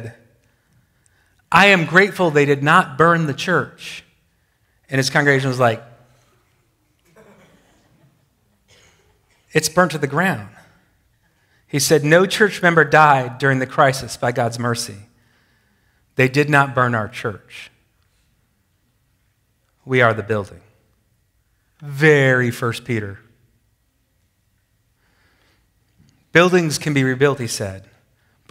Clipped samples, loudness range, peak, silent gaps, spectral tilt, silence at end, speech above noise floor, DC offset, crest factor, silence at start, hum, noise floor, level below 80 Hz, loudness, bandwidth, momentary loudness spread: under 0.1%; 9 LU; 0 dBFS; none; -5 dB/octave; 0.7 s; 48 dB; under 0.1%; 20 dB; 0 s; none; -64 dBFS; -58 dBFS; -16 LUFS; 16 kHz; 17 LU